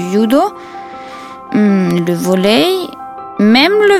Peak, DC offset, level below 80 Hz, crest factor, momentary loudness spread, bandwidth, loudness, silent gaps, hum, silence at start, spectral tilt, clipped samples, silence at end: 0 dBFS; under 0.1%; -52 dBFS; 12 dB; 20 LU; 15.5 kHz; -12 LUFS; none; none; 0 s; -5.5 dB/octave; under 0.1%; 0 s